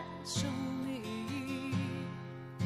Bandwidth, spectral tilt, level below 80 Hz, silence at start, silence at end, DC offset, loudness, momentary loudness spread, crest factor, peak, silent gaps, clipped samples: 15 kHz; -5 dB/octave; -66 dBFS; 0 s; 0 s; under 0.1%; -38 LUFS; 7 LU; 16 dB; -22 dBFS; none; under 0.1%